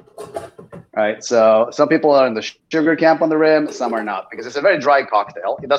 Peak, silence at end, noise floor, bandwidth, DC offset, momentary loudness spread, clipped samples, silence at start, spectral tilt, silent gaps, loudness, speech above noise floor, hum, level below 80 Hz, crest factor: -2 dBFS; 0 s; -39 dBFS; 11 kHz; under 0.1%; 14 LU; under 0.1%; 0.2 s; -5 dB/octave; none; -16 LUFS; 24 dB; none; -64 dBFS; 16 dB